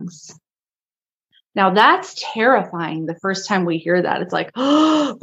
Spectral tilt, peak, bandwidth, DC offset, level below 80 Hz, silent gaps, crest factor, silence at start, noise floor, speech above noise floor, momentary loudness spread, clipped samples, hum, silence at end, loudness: -5 dB/octave; 0 dBFS; 8.2 kHz; under 0.1%; -72 dBFS; 0.82-0.86 s, 1.14-1.18 s; 18 dB; 0 s; under -90 dBFS; over 72 dB; 12 LU; under 0.1%; none; 0.05 s; -18 LUFS